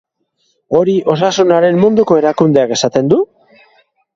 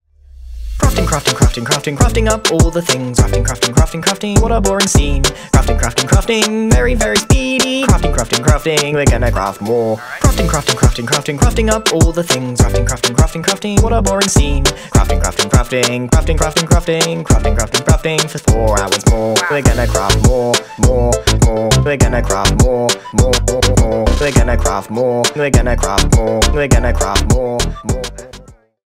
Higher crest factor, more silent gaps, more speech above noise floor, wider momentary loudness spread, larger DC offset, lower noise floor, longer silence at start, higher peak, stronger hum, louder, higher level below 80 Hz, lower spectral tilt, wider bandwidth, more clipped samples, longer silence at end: about the same, 12 dB vs 12 dB; neither; first, 52 dB vs 26 dB; about the same, 4 LU vs 4 LU; neither; first, -63 dBFS vs -39 dBFS; first, 0.7 s vs 0.4 s; about the same, 0 dBFS vs 0 dBFS; neither; about the same, -12 LUFS vs -13 LUFS; second, -54 dBFS vs -18 dBFS; about the same, -5.5 dB/octave vs -4.5 dB/octave; second, 7.8 kHz vs 16.5 kHz; neither; first, 0.9 s vs 0.4 s